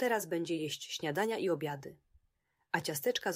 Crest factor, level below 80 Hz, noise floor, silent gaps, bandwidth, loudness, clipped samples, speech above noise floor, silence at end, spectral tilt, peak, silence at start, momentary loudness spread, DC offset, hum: 20 dB; -76 dBFS; -78 dBFS; none; 16 kHz; -35 LUFS; under 0.1%; 43 dB; 0 s; -4 dB/octave; -16 dBFS; 0 s; 7 LU; under 0.1%; none